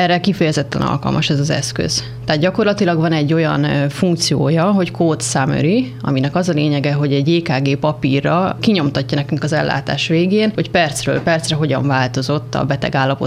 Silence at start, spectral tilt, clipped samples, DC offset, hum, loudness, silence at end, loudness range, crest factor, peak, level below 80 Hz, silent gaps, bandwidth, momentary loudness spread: 0 s; -5.5 dB/octave; under 0.1%; under 0.1%; none; -16 LUFS; 0 s; 1 LU; 14 dB; -2 dBFS; -44 dBFS; none; 14 kHz; 4 LU